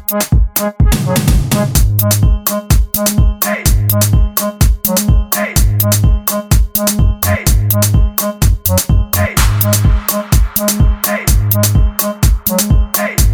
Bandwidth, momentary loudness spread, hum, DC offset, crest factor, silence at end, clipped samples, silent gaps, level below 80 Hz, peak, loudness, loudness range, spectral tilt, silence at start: 18.5 kHz; 3 LU; none; under 0.1%; 12 dB; 0 s; under 0.1%; none; -14 dBFS; 0 dBFS; -12 LUFS; 0 LU; -4.5 dB/octave; 0 s